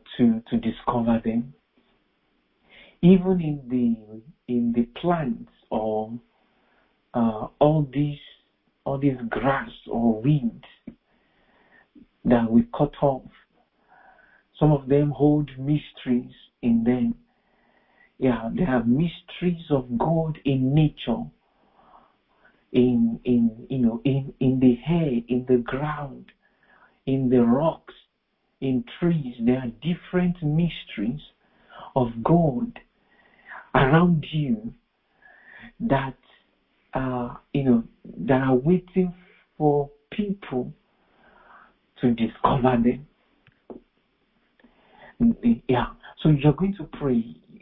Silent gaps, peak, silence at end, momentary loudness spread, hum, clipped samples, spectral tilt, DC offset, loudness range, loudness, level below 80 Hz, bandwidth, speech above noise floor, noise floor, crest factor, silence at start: none; -4 dBFS; 0.05 s; 12 LU; none; under 0.1%; -12.5 dB/octave; under 0.1%; 4 LU; -24 LUFS; -48 dBFS; 4 kHz; 50 dB; -73 dBFS; 20 dB; 0.1 s